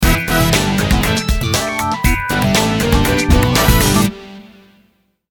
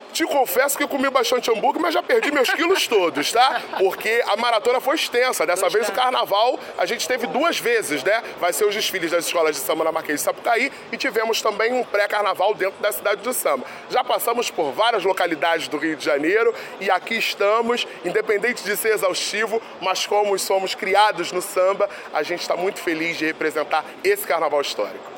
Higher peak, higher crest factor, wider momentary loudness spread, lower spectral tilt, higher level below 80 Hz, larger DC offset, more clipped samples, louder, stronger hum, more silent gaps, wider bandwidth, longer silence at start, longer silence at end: first, 0 dBFS vs -4 dBFS; about the same, 14 dB vs 18 dB; about the same, 5 LU vs 5 LU; first, -4.5 dB/octave vs -2 dB/octave; first, -22 dBFS vs -70 dBFS; neither; neither; first, -14 LUFS vs -21 LUFS; neither; neither; about the same, 18 kHz vs 17 kHz; about the same, 0 s vs 0 s; first, 0.9 s vs 0 s